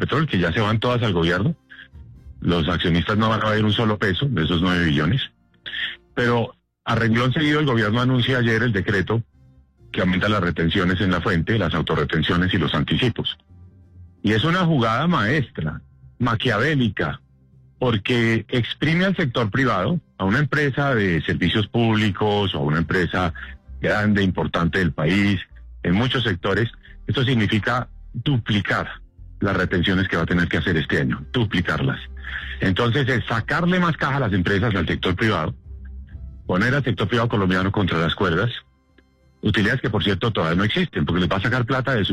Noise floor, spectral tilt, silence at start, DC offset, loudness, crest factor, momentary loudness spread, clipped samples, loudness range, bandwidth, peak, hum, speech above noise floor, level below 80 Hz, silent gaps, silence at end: -57 dBFS; -7 dB/octave; 0 s; under 0.1%; -21 LUFS; 12 dB; 8 LU; under 0.1%; 2 LU; 10.5 kHz; -10 dBFS; none; 37 dB; -42 dBFS; none; 0 s